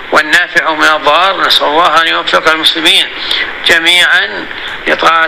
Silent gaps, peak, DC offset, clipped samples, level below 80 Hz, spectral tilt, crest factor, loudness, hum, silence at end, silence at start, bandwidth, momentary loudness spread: none; 0 dBFS; 1%; 1%; -42 dBFS; -1 dB/octave; 10 dB; -8 LUFS; none; 0 s; 0 s; over 20 kHz; 7 LU